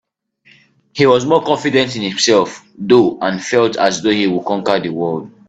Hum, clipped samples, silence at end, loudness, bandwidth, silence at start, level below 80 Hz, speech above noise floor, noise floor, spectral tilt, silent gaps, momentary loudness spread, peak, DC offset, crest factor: none; under 0.1%; 0.2 s; -15 LUFS; 9 kHz; 0.95 s; -56 dBFS; 38 dB; -53 dBFS; -4.5 dB/octave; none; 8 LU; 0 dBFS; under 0.1%; 16 dB